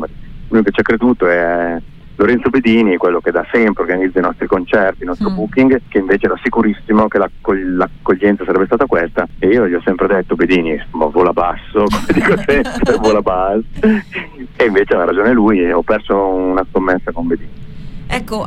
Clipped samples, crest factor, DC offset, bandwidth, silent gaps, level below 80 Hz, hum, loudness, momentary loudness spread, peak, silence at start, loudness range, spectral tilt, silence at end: under 0.1%; 12 dB; under 0.1%; 12.5 kHz; none; -32 dBFS; none; -14 LUFS; 7 LU; -2 dBFS; 0 s; 1 LU; -7 dB/octave; 0 s